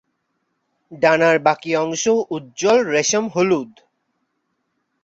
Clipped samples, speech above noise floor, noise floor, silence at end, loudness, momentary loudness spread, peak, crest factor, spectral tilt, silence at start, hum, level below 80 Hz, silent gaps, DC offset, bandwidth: under 0.1%; 54 dB; -72 dBFS; 1.4 s; -18 LUFS; 7 LU; -2 dBFS; 18 dB; -3.5 dB/octave; 0.9 s; none; -64 dBFS; none; under 0.1%; 8 kHz